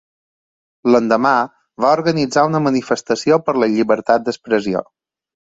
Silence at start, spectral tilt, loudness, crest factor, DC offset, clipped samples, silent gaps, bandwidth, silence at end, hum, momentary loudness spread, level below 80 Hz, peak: 0.85 s; -5.5 dB/octave; -16 LUFS; 16 dB; under 0.1%; under 0.1%; none; 8 kHz; 0.6 s; none; 5 LU; -58 dBFS; -2 dBFS